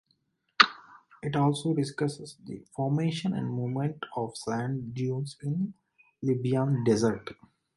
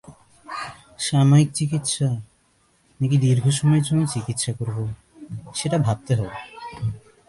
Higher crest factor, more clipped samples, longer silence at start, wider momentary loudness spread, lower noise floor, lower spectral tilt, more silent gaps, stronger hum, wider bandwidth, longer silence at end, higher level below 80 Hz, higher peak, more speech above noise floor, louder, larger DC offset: first, 26 dB vs 16 dB; neither; first, 0.6 s vs 0.1 s; second, 14 LU vs 17 LU; first, -74 dBFS vs -62 dBFS; about the same, -6 dB/octave vs -5.5 dB/octave; neither; neither; about the same, 11.5 kHz vs 11.5 kHz; first, 0.45 s vs 0.3 s; second, -66 dBFS vs -52 dBFS; first, -2 dBFS vs -6 dBFS; about the same, 44 dB vs 42 dB; second, -29 LUFS vs -22 LUFS; neither